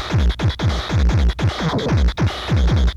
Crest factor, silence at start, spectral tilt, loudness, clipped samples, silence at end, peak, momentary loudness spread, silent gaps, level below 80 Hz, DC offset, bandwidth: 10 dB; 0 s; -6.5 dB/octave; -19 LUFS; under 0.1%; 0 s; -6 dBFS; 3 LU; none; -20 dBFS; under 0.1%; 8.4 kHz